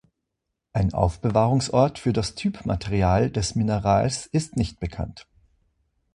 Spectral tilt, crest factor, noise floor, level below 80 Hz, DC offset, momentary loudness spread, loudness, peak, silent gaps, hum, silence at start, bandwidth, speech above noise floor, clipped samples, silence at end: -6 dB/octave; 18 dB; -81 dBFS; -38 dBFS; under 0.1%; 9 LU; -24 LUFS; -6 dBFS; none; none; 0.75 s; 11 kHz; 59 dB; under 0.1%; 0.9 s